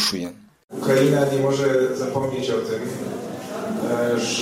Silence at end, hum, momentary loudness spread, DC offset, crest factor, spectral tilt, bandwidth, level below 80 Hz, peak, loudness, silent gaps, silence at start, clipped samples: 0 s; none; 12 LU; under 0.1%; 16 dB; -5 dB/octave; 16 kHz; -60 dBFS; -6 dBFS; -22 LUFS; 0.64-0.68 s; 0 s; under 0.1%